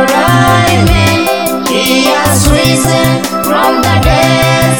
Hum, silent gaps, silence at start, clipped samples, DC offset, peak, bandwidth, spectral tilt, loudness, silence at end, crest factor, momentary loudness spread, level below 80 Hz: none; none; 0 s; 0.5%; under 0.1%; 0 dBFS; 18 kHz; -4.5 dB/octave; -8 LUFS; 0 s; 8 dB; 4 LU; -22 dBFS